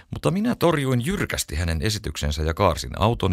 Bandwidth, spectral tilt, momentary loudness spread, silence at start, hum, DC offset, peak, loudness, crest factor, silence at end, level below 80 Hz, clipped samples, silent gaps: 16 kHz; -5.5 dB/octave; 5 LU; 0.1 s; none; under 0.1%; -4 dBFS; -23 LUFS; 18 dB; 0 s; -34 dBFS; under 0.1%; none